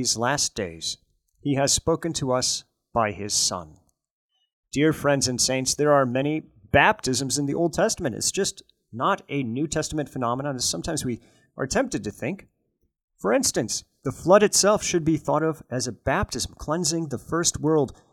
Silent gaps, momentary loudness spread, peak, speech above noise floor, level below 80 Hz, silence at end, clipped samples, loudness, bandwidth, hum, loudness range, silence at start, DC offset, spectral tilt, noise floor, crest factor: 4.11-4.29 s, 4.53-4.63 s, 13.04-13.08 s; 11 LU; -4 dBFS; 49 dB; -48 dBFS; 0.2 s; under 0.1%; -24 LUFS; 18 kHz; none; 5 LU; 0 s; under 0.1%; -3.5 dB/octave; -73 dBFS; 22 dB